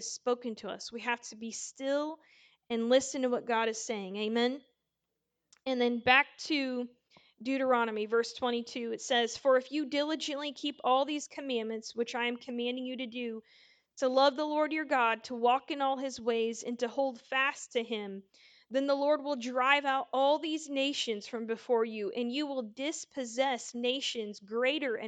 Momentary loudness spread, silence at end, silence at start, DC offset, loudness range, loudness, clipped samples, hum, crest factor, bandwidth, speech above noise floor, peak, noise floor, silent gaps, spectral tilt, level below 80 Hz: 10 LU; 0 s; 0 s; under 0.1%; 3 LU; -32 LUFS; under 0.1%; none; 24 dB; 9.4 kHz; 54 dB; -10 dBFS; -86 dBFS; none; -2.5 dB/octave; -80 dBFS